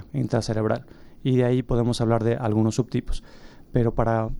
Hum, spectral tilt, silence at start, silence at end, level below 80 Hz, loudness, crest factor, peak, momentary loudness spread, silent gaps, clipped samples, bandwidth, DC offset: none; -7.5 dB/octave; 0 s; 0 s; -36 dBFS; -24 LUFS; 16 dB; -8 dBFS; 8 LU; none; under 0.1%; 11.5 kHz; under 0.1%